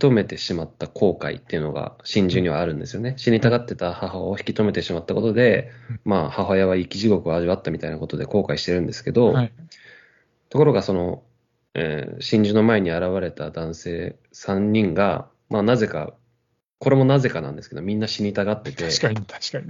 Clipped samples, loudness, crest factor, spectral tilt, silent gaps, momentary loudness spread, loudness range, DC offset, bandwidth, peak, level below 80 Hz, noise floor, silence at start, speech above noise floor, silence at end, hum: under 0.1%; -22 LUFS; 20 dB; -6.5 dB/octave; none; 12 LU; 2 LU; under 0.1%; 7.6 kHz; -2 dBFS; -52 dBFS; -71 dBFS; 0 s; 49 dB; 0 s; none